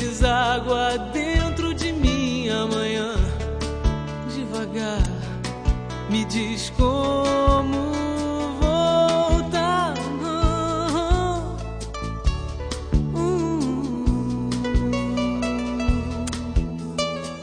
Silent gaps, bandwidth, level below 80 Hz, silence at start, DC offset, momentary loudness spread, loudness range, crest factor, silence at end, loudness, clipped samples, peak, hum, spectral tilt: none; 10 kHz; -28 dBFS; 0 s; under 0.1%; 8 LU; 4 LU; 18 dB; 0 s; -23 LUFS; under 0.1%; -6 dBFS; none; -5.5 dB/octave